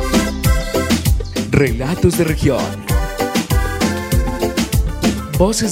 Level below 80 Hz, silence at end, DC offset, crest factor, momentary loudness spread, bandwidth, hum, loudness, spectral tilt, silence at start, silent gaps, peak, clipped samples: -22 dBFS; 0 s; under 0.1%; 16 dB; 4 LU; 16 kHz; none; -17 LUFS; -5 dB/octave; 0 s; none; 0 dBFS; under 0.1%